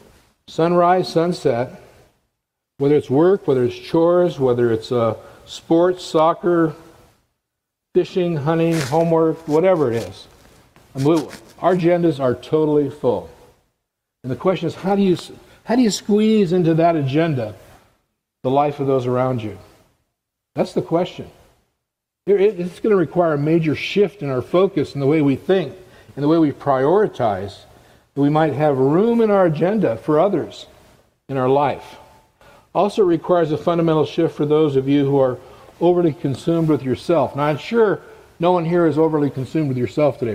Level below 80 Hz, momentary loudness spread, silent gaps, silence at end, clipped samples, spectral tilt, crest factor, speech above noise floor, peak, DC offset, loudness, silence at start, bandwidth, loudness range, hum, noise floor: -56 dBFS; 10 LU; none; 0 s; under 0.1%; -7.5 dB/octave; 16 dB; 62 dB; -2 dBFS; under 0.1%; -18 LUFS; 0.5 s; 15 kHz; 4 LU; none; -79 dBFS